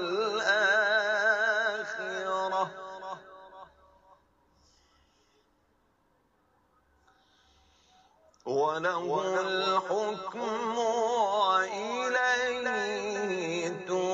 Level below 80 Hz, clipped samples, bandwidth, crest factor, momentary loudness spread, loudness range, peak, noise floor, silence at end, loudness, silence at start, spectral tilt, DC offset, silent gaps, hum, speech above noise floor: -74 dBFS; under 0.1%; 8.2 kHz; 18 dB; 10 LU; 10 LU; -14 dBFS; -70 dBFS; 0 s; -29 LUFS; 0 s; -3 dB/octave; under 0.1%; none; none; 40 dB